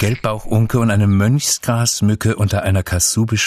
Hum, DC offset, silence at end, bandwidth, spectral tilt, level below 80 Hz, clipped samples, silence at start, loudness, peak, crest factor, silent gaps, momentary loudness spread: none; under 0.1%; 0 s; 14 kHz; -4.5 dB/octave; -38 dBFS; under 0.1%; 0 s; -16 LUFS; -4 dBFS; 12 dB; none; 4 LU